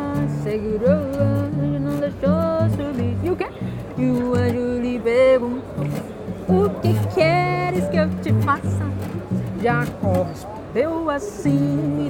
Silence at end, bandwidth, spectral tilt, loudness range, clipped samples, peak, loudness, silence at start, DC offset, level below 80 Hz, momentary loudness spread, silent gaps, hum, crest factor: 0 s; 17 kHz; -8 dB/octave; 3 LU; under 0.1%; -4 dBFS; -21 LUFS; 0 s; under 0.1%; -44 dBFS; 9 LU; none; none; 16 dB